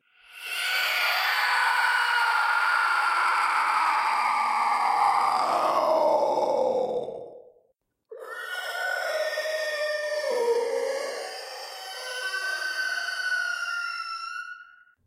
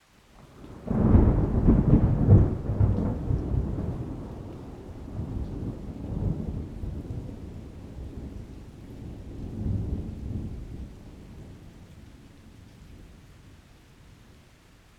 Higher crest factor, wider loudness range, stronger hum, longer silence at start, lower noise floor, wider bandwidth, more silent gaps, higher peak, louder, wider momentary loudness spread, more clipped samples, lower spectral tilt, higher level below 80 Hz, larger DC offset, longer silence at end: second, 16 dB vs 22 dB; second, 7 LU vs 19 LU; neither; about the same, 0.3 s vs 0.4 s; first, -71 dBFS vs -55 dBFS; first, 16 kHz vs 7 kHz; neither; second, -12 dBFS vs -6 dBFS; about the same, -25 LUFS vs -27 LUFS; second, 13 LU vs 25 LU; neither; second, -0.5 dB/octave vs -10.5 dB/octave; second, -80 dBFS vs -34 dBFS; neither; second, 0.4 s vs 1.5 s